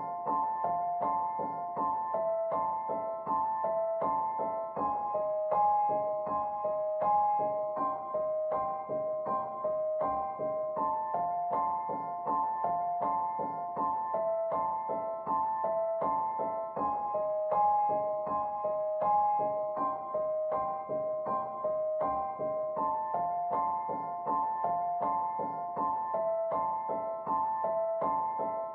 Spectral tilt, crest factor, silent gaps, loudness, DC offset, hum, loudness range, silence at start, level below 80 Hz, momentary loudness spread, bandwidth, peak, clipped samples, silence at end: -7.5 dB/octave; 14 dB; none; -32 LUFS; under 0.1%; none; 2 LU; 0 s; -70 dBFS; 5 LU; 3.4 kHz; -18 dBFS; under 0.1%; 0 s